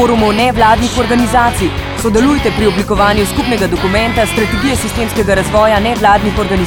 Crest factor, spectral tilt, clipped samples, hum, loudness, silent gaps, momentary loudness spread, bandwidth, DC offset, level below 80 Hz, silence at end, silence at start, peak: 10 dB; -5 dB/octave; under 0.1%; none; -11 LUFS; none; 4 LU; 19 kHz; 0.2%; -24 dBFS; 0 s; 0 s; 0 dBFS